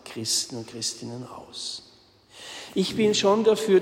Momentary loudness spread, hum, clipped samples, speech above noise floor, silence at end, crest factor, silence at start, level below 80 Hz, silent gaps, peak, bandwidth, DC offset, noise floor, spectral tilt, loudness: 19 LU; none; under 0.1%; 31 dB; 0 s; 16 dB; 0.05 s; -64 dBFS; none; -8 dBFS; 16 kHz; under 0.1%; -55 dBFS; -3.5 dB/octave; -25 LUFS